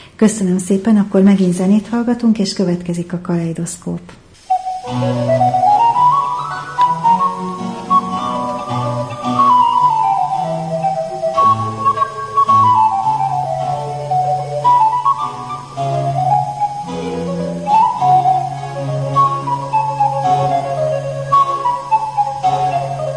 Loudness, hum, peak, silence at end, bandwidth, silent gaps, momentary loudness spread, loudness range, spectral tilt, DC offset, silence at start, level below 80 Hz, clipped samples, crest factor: -15 LUFS; none; -2 dBFS; 0 s; 10.5 kHz; none; 10 LU; 3 LU; -6.5 dB/octave; under 0.1%; 0 s; -50 dBFS; under 0.1%; 12 dB